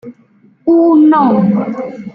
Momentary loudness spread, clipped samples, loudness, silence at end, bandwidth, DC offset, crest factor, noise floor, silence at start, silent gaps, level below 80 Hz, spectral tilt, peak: 13 LU; under 0.1%; -10 LUFS; 0.05 s; 4.7 kHz; under 0.1%; 10 dB; -48 dBFS; 0.05 s; none; -58 dBFS; -10.5 dB/octave; -2 dBFS